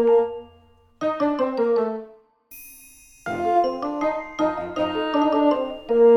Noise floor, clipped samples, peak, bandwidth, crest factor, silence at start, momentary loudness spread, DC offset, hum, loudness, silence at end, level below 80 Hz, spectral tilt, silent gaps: -54 dBFS; under 0.1%; -8 dBFS; 18.5 kHz; 14 dB; 0 s; 17 LU; under 0.1%; none; -23 LUFS; 0 s; -58 dBFS; -5.5 dB/octave; none